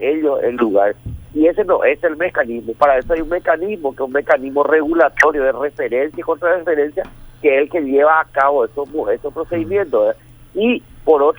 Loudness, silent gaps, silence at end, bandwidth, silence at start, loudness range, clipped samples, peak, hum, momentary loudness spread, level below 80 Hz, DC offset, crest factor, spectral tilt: -16 LUFS; none; 0.05 s; over 20 kHz; 0 s; 1 LU; under 0.1%; 0 dBFS; none; 9 LU; -42 dBFS; under 0.1%; 16 dB; -6 dB/octave